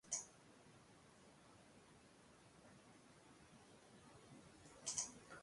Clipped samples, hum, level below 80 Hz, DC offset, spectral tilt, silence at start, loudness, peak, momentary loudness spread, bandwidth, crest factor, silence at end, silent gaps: under 0.1%; none; -82 dBFS; under 0.1%; -1 dB/octave; 0.05 s; -50 LUFS; -28 dBFS; 21 LU; 11.5 kHz; 30 dB; 0 s; none